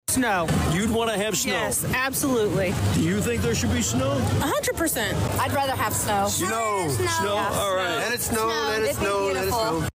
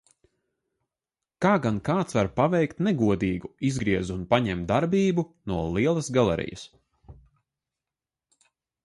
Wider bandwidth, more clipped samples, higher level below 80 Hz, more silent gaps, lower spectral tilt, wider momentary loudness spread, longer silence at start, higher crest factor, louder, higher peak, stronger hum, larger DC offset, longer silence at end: first, 16 kHz vs 11.5 kHz; neither; first, -42 dBFS vs -50 dBFS; neither; second, -4 dB/octave vs -6.5 dB/octave; second, 1 LU vs 6 LU; second, 0.1 s vs 1.4 s; second, 10 dB vs 20 dB; about the same, -23 LUFS vs -25 LUFS; second, -14 dBFS vs -8 dBFS; neither; neither; second, 0.05 s vs 1.7 s